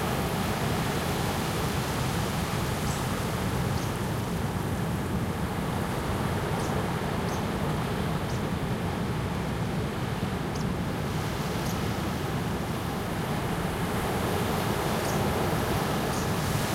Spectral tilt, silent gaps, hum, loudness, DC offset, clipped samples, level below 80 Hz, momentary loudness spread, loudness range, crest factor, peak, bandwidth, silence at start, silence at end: -5.5 dB/octave; none; none; -29 LUFS; under 0.1%; under 0.1%; -42 dBFS; 3 LU; 2 LU; 16 dB; -14 dBFS; 16 kHz; 0 s; 0 s